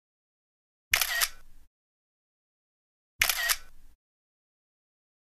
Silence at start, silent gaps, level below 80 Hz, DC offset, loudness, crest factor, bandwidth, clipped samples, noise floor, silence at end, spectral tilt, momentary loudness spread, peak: 0.9 s; 1.67-3.19 s; -54 dBFS; under 0.1%; -27 LUFS; 32 dB; 15.5 kHz; under 0.1%; under -90 dBFS; 1.3 s; 2 dB/octave; 5 LU; -4 dBFS